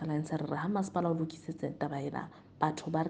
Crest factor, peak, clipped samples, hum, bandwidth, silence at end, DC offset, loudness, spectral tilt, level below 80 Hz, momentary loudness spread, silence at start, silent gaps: 22 dB; -12 dBFS; under 0.1%; none; 9.4 kHz; 0 s; under 0.1%; -35 LUFS; -7 dB/octave; -70 dBFS; 7 LU; 0 s; none